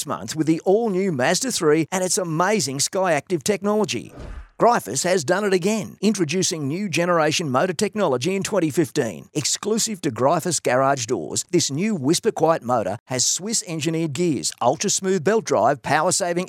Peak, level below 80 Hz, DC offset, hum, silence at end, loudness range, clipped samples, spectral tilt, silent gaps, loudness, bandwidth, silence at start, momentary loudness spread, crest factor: -4 dBFS; -54 dBFS; under 0.1%; none; 0 s; 1 LU; under 0.1%; -4 dB/octave; 13.00-13.06 s; -21 LUFS; 17 kHz; 0 s; 5 LU; 18 dB